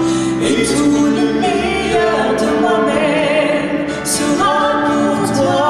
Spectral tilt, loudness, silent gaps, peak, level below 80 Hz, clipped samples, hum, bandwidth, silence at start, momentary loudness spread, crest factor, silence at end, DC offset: -4.5 dB/octave; -14 LUFS; none; -4 dBFS; -40 dBFS; under 0.1%; none; 13.5 kHz; 0 s; 3 LU; 10 dB; 0 s; under 0.1%